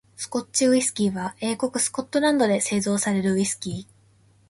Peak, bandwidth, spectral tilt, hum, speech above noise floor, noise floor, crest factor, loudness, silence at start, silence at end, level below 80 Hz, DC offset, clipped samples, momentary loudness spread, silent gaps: -8 dBFS; 12 kHz; -4 dB/octave; none; 35 dB; -58 dBFS; 16 dB; -23 LUFS; 0.2 s; 0.65 s; -60 dBFS; under 0.1%; under 0.1%; 10 LU; none